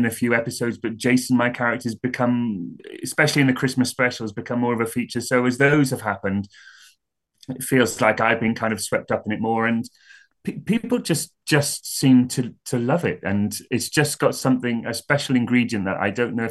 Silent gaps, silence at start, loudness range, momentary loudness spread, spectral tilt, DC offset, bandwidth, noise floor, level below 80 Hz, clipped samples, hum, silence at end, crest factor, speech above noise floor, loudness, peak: none; 0 s; 2 LU; 9 LU; -5 dB/octave; under 0.1%; 12.5 kHz; -69 dBFS; -62 dBFS; under 0.1%; none; 0 s; 20 dB; 48 dB; -21 LUFS; -2 dBFS